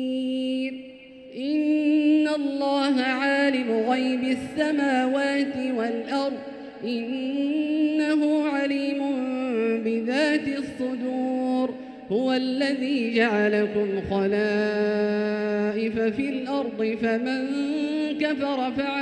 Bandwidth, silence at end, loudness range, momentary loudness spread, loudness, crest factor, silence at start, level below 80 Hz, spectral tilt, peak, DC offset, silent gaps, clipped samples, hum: 9.4 kHz; 0 s; 3 LU; 7 LU; -25 LUFS; 16 dB; 0 s; -62 dBFS; -5.5 dB/octave; -8 dBFS; under 0.1%; none; under 0.1%; none